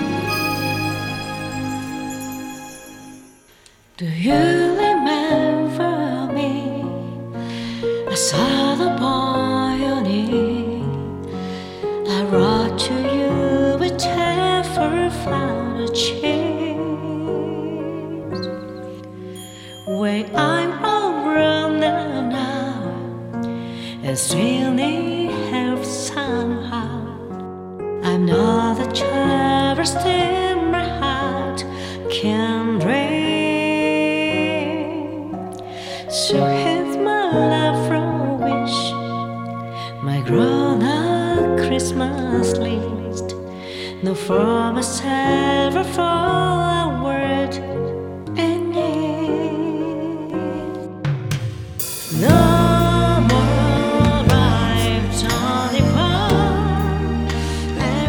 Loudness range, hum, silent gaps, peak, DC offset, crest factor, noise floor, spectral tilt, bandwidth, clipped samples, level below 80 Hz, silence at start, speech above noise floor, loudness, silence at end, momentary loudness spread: 6 LU; none; none; 0 dBFS; under 0.1%; 20 dB; -50 dBFS; -5.5 dB/octave; 17.5 kHz; under 0.1%; -36 dBFS; 0 s; 33 dB; -20 LUFS; 0 s; 12 LU